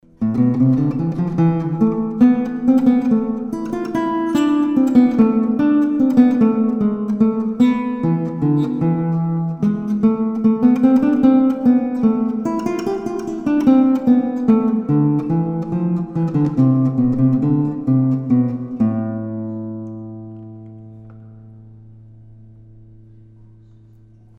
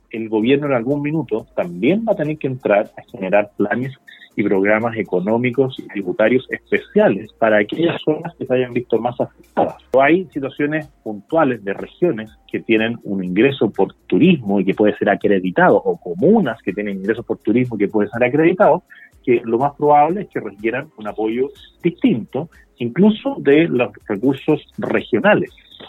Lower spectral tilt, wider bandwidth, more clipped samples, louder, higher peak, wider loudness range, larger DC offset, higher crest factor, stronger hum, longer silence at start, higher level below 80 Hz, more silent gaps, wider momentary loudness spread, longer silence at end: about the same, -9.5 dB/octave vs -8.5 dB/octave; first, 8.2 kHz vs 4.2 kHz; neither; about the same, -17 LUFS vs -18 LUFS; about the same, -2 dBFS vs 0 dBFS; first, 6 LU vs 3 LU; neither; about the same, 16 dB vs 18 dB; neither; about the same, 0.2 s vs 0.15 s; first, -50 dBFS vs -56 dBFS; neither; about the same, 10 LU vs 10 LU; first, 2.45 s vs 0 s